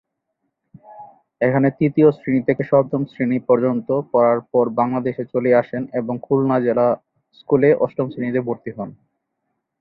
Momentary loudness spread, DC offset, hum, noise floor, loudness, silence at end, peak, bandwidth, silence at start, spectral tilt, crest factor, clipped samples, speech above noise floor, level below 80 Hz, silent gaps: 9 LU; under 0.1%; none; -75 dBFS; -19 LUFS; 0.9 s; -2 dBFS; 4.7 kHz; 0.9 s; -11.5 dB/octave; 18 dB; under 0.1%; 57 dB; -60 dBFS; none